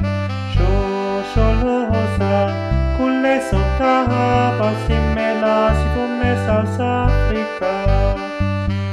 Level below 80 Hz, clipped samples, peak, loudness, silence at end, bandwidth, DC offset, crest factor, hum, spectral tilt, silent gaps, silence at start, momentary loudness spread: -22 dBFS; under 0.1%; -2 dBFS; -18 LUFS; 0 s; 11 kHz; under 0.1%; 14 dB; none; -7.5 dB/octave; none; 0 s; 5 LU